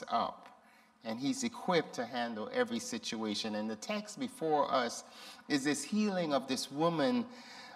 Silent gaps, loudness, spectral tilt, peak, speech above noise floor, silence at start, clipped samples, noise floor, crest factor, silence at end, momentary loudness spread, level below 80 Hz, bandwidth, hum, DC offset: none; -35 LUFS; -4 dB/octave; -18 dBFS; 28 dB; 0 s; under 0.1%; -63 dBFS; 18 dB; 0 s; 12 LU; -80 dBFS; 15 kHz; none; under 0.1%